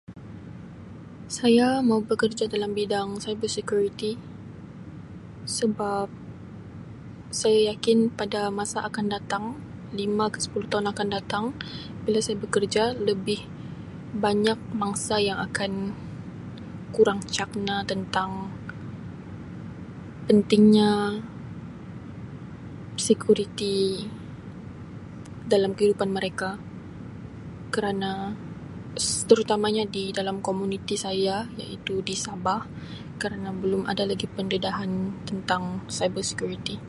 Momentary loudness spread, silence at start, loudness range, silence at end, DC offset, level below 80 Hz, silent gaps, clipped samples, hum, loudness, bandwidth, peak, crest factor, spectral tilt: 19 LU; 0.1 s; 5 LU; 0 s; under 0.1%; -54 dBFS; none; under 0.1%; none; -26 LUFS; 11.5 kHz; -4 dBFS; 24 dB; -4.5 dB/octave